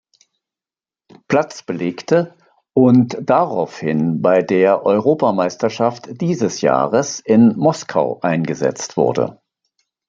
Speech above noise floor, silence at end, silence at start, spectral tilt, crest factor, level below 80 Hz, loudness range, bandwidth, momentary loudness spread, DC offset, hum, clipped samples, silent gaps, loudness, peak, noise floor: over 74 dB; 0.75 s; 1.3 s; -6.5 dB/octave; 16 dB; -60 dBFS; 2 LU; 7.6 kHz; 9 LU; under 0.1%; none; under 0.1%; none; -17 LUFS; -2 dBFS; under -90 dBFS